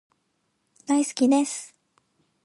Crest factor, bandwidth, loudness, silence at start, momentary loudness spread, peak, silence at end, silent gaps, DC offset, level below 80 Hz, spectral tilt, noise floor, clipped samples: 18 dB; 11.5 kHz; -24 LUFS; 0.9 s; 21 LU; -10 dBFS; 0.75 s; none; under 0.1%; -84 dBFS; -3 dB/octave; -73 dBFS; under 0.1%